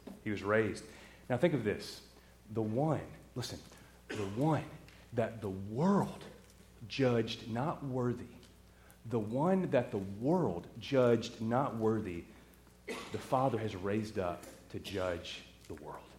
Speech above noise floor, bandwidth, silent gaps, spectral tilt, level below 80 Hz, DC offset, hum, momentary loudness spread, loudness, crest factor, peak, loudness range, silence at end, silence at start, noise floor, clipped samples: 25 dB; 16.5 kHz; none; -6.5 dB/octave; -64 dBFS; under 0.1%; none; 18 LU; -35 LUFS; 20 dB; -16 dBFS; 5 LU; 0 s; 0.05 s; -60 dBFS; under 0.1%